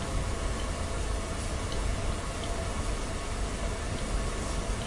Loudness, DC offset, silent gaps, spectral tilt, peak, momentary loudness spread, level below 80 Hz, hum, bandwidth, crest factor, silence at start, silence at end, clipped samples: -34 LUFS; under 0.1%; none; -4.5 dB/octave; -18 dBFS; 1 LU; -34 dBFS; none; 11.5 kHz; 14 dB; 0 s; 0 s; under 0.1%